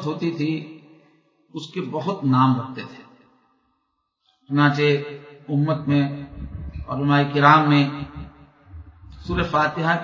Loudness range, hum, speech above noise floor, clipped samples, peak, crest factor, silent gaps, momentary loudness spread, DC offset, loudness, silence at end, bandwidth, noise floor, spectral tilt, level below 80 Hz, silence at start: 6 LU; none; 53 dB; under 0.1%; 0 dBFS; 22 dB; none; 20 LU; under 0.1%; -20 LUFS; 0 s; 7.4 kHz; -73 dBFS; -7.5 dB/octave; -44 dBFS; 0 s